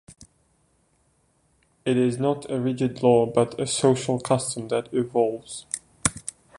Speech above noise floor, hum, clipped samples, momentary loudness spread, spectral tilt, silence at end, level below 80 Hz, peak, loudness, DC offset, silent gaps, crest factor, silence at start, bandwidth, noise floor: 43 dB; none; under 0.1%; 12 LU; -5 dB/octave; 0.3 s; -56 dBFS; 0 dBFS; -24 LUFS; under 0.1%; none; 24 dB; 0.1 s; 11.5 kHz; -66 dBFS